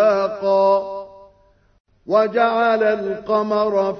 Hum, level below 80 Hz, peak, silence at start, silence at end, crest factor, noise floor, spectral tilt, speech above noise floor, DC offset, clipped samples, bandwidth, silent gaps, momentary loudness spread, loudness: none; -60 dBFS; -4 dBFS; 0 s; 0 s; 14 dB; -56 dBFS; -6.5 dB/octave; 38 dB; under 0.1%; under 0.1%; 6.4 kHz; 1.80-1.85 s; 6 LU; -18 LUFS